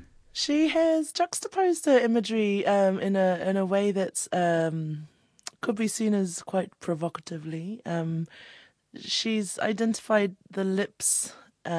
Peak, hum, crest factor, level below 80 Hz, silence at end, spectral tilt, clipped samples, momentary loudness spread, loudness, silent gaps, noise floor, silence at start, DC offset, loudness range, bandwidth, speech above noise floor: -10 dBFS; none; 16 dB; -70 dBFS; 0 s; -4.5 dB/octave; under 0.1%; 13 LU; -27 LUFS; none; -47 dBFS; 0 s; under 0.1%; 7 LU; 11 kHz; 21 dB